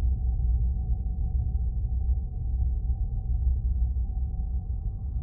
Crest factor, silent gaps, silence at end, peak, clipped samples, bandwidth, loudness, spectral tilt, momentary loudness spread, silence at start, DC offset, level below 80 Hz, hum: 12 dB; none; 0 s; -16 dBFS; under 0.1%; 0.8 kHz; -30 LUFS; -17 dB/octave; 5 LU; 0 s; under 0.1%; -26 dBFS; none